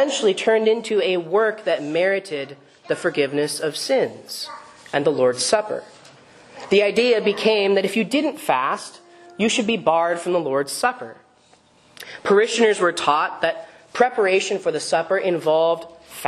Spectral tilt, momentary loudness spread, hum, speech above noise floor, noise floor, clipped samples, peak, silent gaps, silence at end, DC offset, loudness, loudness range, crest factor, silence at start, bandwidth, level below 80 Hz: -3.5 dB/octave; 13 LU; none; 35 dB; -55 dBFS; under 0.1%; -2 dBFS; none; 0 s; under 0.1%; -20 LUFS; 3 LU; 20 dB; 0 s; 13 kHz; -68 dBFS